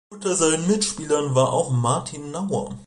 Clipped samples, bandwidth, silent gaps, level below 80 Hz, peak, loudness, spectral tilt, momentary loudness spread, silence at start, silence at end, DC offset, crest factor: under 0.1%; 11.5 kHz; none; -56 dBFS; -6 dBFS; -22 LUFS; -4.5 dB/octave; 7 LU; 0.1 s; 0.05 s; under 0.1%; 16 dB